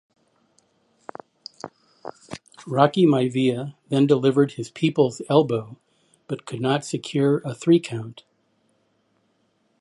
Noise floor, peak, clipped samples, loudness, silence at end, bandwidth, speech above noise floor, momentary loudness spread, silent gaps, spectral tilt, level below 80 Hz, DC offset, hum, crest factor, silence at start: -67 dBFS; -2 dBFS; under 0.1%; -22 LUFS; 1.7 s; 11.5 kHz; 46 dB; 23 LU; none; -6.5 dB/octave; -68 dBFS; under 0.1%; none; 22 dB; 1.65 s